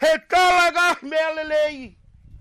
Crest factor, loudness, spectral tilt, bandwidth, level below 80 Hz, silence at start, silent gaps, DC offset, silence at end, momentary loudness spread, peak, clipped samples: 10 dB; -19 LUFS; -2 dB/octave; 16 kHz; -50 dBFS; 0 s; none; under 0.1%; 0 s; 8 LU; -10 dBFS; under 0.1%